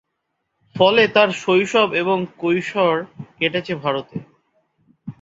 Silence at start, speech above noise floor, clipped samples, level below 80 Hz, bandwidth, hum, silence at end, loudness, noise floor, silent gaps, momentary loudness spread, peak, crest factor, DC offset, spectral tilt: 0.75 s; 57 dB; under 0.1%; -62 dBFS; 8 kHz; none; 0.1 s; -18 LUFS; -75 dBFS; none; 21 LU; 0 dBFS; 20 dB; under 0.1%; -5 dB/octave